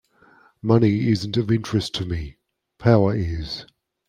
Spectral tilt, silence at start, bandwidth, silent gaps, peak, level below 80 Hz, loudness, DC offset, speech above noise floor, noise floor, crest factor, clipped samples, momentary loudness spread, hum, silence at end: -7 dB/octave; 0.65 s; 11 kHz; none; -2 dBFS; -44 dBFS; -22 LUFS; under 0.1%; 35 dB; -55 dBFS; 20 dB; under 0.1%; 13 LU; none; 0.45 s